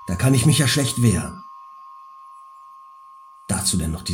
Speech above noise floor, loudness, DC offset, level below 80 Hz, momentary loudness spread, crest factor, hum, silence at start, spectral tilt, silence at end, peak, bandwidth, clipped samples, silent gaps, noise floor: 26 dB; -19 LUFS; under 0.1%; -44 dBFS; 25 LU; 18 dB; none; 0 s; -4.5 dB/octave; 0 s; -4 dBFS; 17 kHz; under 0.1%; none; -45 dBFS